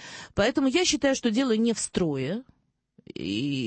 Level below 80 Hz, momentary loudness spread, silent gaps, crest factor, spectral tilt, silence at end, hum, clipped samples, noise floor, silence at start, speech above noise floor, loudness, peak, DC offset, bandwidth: -54 dBFS; 11 LU; none; 16 dB; -4 dB/octave; 0 s; none; under 0.1%; -63 dBFS; 0 s; 37 dB; -26 LUFS; -10 dBFS; under 0.1%; 8.8 kHz